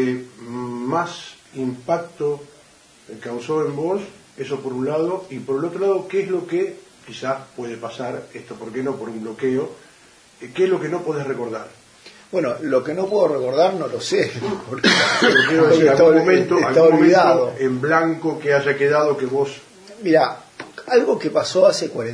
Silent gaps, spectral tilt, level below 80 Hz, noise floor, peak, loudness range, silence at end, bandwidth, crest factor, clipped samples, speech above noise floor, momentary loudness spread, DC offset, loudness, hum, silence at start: none; -5 dB/octave; -64 dBFS; -50 dBFS; -2 dBFS; 12 LU; 0 s; 10.5 kHz; 18 dB; under 0.1%; 32 dB; 17 LU; under 0.1%; -19 LUFS; none; 0 s